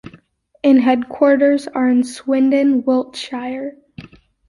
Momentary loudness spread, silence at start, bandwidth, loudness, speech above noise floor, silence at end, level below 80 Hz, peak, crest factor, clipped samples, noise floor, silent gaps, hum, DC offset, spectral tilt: 13 LU; 0.65 s; 11.5 kHz; -16 LUFS; 35 dB; 0.45 s; -58 dBFS; -2 dBFS; 14 dB; under 0.1%; -50 dBFS; none; none; under 0.1%; -5 dB/octave